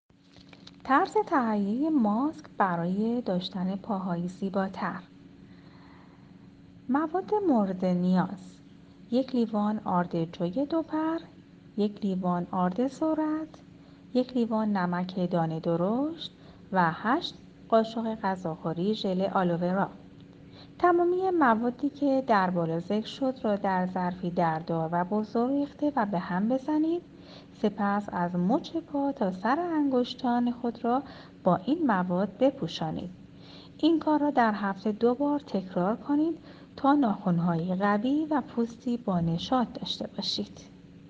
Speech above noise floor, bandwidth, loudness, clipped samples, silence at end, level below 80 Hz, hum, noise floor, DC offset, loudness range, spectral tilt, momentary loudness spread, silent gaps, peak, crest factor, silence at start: 26 dB; 7.8 kHz; -28 LUFS; under 0.1%; 0 s; -64 dBFS; none; -54 dBFS; under 0.1%; 3 LU; -7.5 dB/octave; 8 LU; none; -10 dBFS; 20 dB; 0.85 s